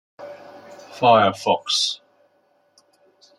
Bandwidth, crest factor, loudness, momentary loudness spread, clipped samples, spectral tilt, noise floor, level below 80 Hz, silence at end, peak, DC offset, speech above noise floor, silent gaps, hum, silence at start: 13 kHz; 20 dB; -18 LUFS; 25 LU; under 0.1%; -3 dB/octave; -63 dBFS; -70 dBFS; 1.45 s; -2 dBFS; under 0.1%; 45 dB; none; none; 0.2 s